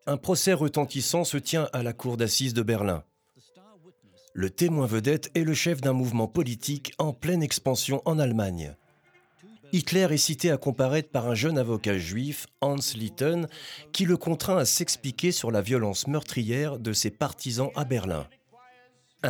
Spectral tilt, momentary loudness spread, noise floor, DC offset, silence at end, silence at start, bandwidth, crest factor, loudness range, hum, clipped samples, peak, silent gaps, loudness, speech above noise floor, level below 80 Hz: -4.5 dB/octave; 8 LU; -62 dBFS; under 0.1%; 0 s; 0.05 s; over 20 kHz; 16 dB; 3 LU; none; under 0.1%; -12 dBFS; none; -27 LUFS; 36 dB; -58 dBFS